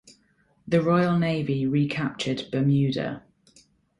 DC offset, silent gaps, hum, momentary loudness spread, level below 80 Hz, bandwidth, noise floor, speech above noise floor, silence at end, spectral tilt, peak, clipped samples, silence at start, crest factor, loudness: under 0.1%; none; none; 8 LU; -60 dBFS; 11 kHz; -65 dBFS; 41 dB; 0.8 s; -7.5 dB/octave; -10 dBFS; under 0.1%; 0.65 s; 16 dB; -25 LUFS